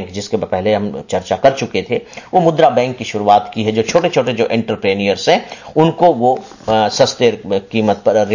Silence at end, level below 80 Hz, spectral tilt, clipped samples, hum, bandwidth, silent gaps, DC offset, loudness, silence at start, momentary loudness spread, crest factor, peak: 0 s; -48 dBFS; -5 dB/octave; under 0.1%; none; 7.4 kHz; none; under 0.1%; -15 LUFS; 0 s; 9 LU; 14 dB; 0 dBFS